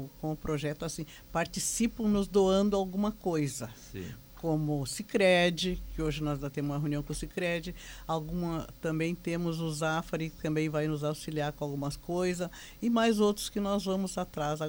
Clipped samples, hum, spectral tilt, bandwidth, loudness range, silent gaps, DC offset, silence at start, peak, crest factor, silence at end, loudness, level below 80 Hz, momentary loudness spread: under 0.1%; none; -5 dB/octave; over 20 kHz; 4 LU; none; under 0.1%; 0 s; -14 dBFS; 18 dB; 0 s; -31 LUFS; -50 dBFS; 11 LU